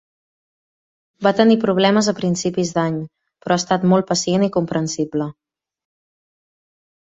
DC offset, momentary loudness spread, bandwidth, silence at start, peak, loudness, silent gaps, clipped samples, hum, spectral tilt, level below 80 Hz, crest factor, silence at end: under 0.1%; 10 LU; 8.2 kHz; 1.2 s; -2 dBFS; -18 LUFS; none; under 0.1%; none; -5 dB/octave; -58 dBFS; 18 dB; 1.7 s